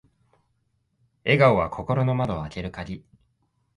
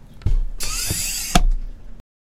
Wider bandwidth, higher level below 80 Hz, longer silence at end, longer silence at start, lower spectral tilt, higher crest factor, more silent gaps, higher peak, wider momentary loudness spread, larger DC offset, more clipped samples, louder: second, 10.5 kHz vs 16.5 kHz; second, -48 dBFS vs -22 dBFS; first, 0.8 s vs 0.25 s; first, 1.25 s vs 0.05 s; first, -8 dB/octave vs -3 dB/octave; about the same, 22 dB vs 20 dB; neither; second, -4 dBFS vs 0 dBFS; first, 18 LU vs 9 LU; neither; neither; about the same, -23 LUFS vs -23 LUFS